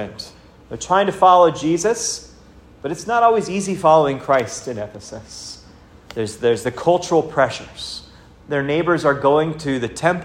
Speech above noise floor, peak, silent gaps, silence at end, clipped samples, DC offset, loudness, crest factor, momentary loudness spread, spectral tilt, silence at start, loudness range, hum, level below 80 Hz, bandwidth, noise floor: 27 dB; 0 dBFS; none; 0 s; under 0.1%; under 0.1%; -18 LUFS; 18 dB; 19 LU; -4.5 dB/octave; 0 s; 4 LU; none; -50 dBFS; 15.5 kHz; -45 dBFS